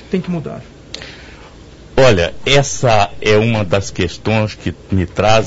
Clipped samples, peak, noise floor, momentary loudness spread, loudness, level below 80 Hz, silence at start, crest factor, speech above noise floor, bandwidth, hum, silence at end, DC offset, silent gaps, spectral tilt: under 0.1%; 0 dBFS; -38 dBFS; 18 LU; -15 LUFS; -34 dBFS; 0 s; 14 dB; 24 dB; 8 kHz; none; 0 s; under 0.1%; none; -5 dB/octave